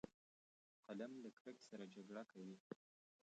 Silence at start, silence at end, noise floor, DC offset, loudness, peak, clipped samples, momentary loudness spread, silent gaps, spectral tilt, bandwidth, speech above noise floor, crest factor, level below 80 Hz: 0.05 s; 0.5 s; under -90 dBFS; under 0.1%; -57 LUFS; -36 dBFS; under 0.1%; 8 LU; 0.14-0.83 s, 1.33-1.45 s, 2.60-2.70 s; -6 dB/octave; 8.8 kHz; over 34 dB; 22 dB; -90 dBFS